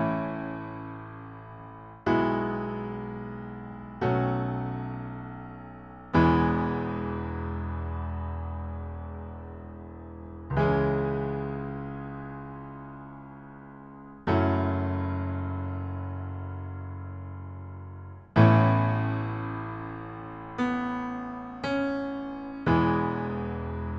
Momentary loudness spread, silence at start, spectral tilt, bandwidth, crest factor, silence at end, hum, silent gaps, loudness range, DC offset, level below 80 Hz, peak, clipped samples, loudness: 19 LU; 0 s; -9.5 dB/octave; 6.4 kHz; 22 dB; 0 s; none; none; 8 LU; under 0.1%; -46 dBFS; -6 dBFS; under 0.1%; -29 LUFS